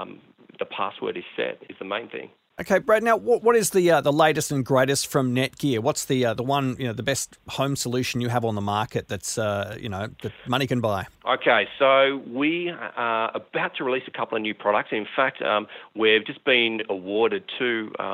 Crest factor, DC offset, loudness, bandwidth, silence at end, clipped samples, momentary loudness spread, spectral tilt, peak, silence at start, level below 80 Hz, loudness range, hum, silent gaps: 20 dB; under 0.1%; -23 LUFS; 16 kHz; 0 s; under 0.1%; 11 LU; -4 dB/octave; -4 dBFS; 0 s; -60 dBFS; 5 LU; none; none